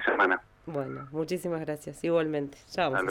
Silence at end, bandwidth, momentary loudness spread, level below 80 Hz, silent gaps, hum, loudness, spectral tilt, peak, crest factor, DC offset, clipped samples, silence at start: 0 s; 17 kHz; 10 LU; -62 dBFS; none; none; -30 LUFS; -5.5 dB/octave; -12 dBFS; 18 dB; under 0.1%; under 0.1%; 0 s